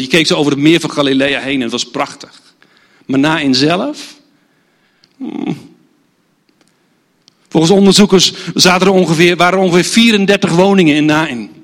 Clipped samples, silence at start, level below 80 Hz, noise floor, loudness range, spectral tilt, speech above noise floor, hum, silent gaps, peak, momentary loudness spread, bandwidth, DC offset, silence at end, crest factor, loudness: 0.2%; 0 s; -50 dBFS; -57 dBFS; 15 LU; -4.5 dB/octave; 46 dB; none; none; 0 dBFS; 14 LU; 16.5 kHz; under 0.1%; 0.15 s; 12 dB; -11 LUFS